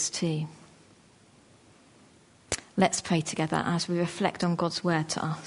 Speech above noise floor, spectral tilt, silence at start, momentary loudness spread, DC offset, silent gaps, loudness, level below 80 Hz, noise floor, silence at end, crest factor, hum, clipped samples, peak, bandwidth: 30 dB; -4.5 dB/octave; 0 s; 8 LU; under 0.1%; none; -29 LUFS; -62 dBFS; -58 dBFS; 0 s; 22 dB; none; under 0.1%; -8 dBFS; 11 kHz